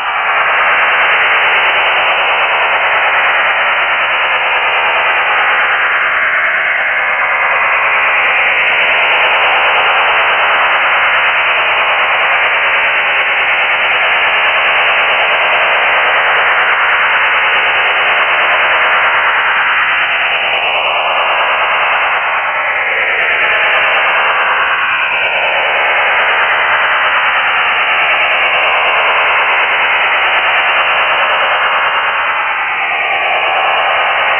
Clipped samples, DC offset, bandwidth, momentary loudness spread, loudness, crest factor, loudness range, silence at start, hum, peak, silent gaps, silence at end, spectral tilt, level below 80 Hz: under 0.1%; under 0.1%; 3.6 kHz; 2 LU; -9 LUFS; 10 dB; 2 LU; 0 s; none; 0 dBFS; none; 0 s; -3.5 dB/octave; -50 dBFS